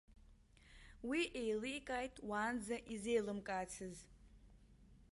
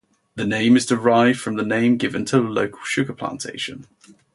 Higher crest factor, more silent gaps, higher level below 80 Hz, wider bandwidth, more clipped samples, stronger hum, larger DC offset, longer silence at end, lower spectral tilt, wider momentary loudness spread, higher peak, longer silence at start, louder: about the same, 20 dB vs 18 dB; neither; second, -66 dBFS vs -60 dBFS; about the same, 11.5 kHz vs 11.5 kHz; neither; neither; neither; second, 0.1 s vs 0.5 s; about the same, -4 dB/octave vs -5 dB/octave; about the same, 12 LU vs 12 LU; second, -26 dBFS vs -4 dBFS; second, 0.1 s vs 0.35 s; second, -43 LUFS vs -20 LUFS